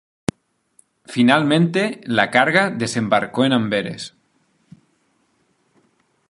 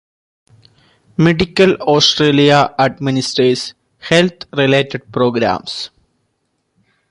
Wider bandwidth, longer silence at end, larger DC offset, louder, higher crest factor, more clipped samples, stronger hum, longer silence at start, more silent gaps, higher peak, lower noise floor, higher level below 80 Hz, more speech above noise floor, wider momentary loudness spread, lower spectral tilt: about the same, 11.5 kHz vs 11.5 kHz; first, 2.2 s vs 1.25 s; neither; second, -18 LUFS vs -14 LUFS; about the same, 20 dB vs 16 dB; neither; neither; about the same, 1.1 s vs 1.2 s; neither; about the same, 0 dBFS vs 0 dBFS; about the same, -64 dBFS vs -67 dBFS; second, -58 dBFS vs -46 dBFS; second, 46 dB vs 54 dB; about the same, 14 LU vs 14 LU; about the same, -5.5 dB/octave vs -5 dB/octave